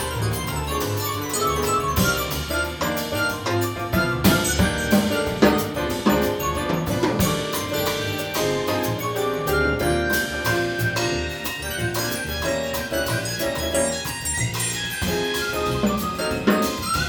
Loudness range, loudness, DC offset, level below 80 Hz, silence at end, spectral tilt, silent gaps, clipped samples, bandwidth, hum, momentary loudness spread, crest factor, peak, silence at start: 3 LU; -22 LUFS; under 0.1%; -38 dBFS; 0 s; -4 dB/octave; none; under 0.1%; over 20 kHz; none; 6 LU; 20 dB; -2 dBFS; 0 s